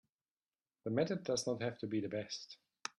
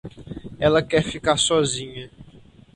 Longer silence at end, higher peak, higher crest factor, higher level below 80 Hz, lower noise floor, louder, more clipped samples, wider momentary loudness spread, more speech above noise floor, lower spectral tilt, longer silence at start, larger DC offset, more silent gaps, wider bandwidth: second, 0.1 s vs 0.4 s; second, -22 dBFS vs -4 dBFS; about the same, 20 dB vs 20 dB; second, -80 dBFS vs -46 dBFS; first, under -90 dBFS vs -48 dBFS; second, -39 LUFS vs -21 LUFS; neither; second, 11 LU vs 19 LU; first, over 51 dB vs 28 dB; about the same, -4.5 dB/octave vs -3.5 dB/octave; first, 0.85 s vs 0.05 s; neither; neither; about the same, 12 kHz vs 11.5 kHz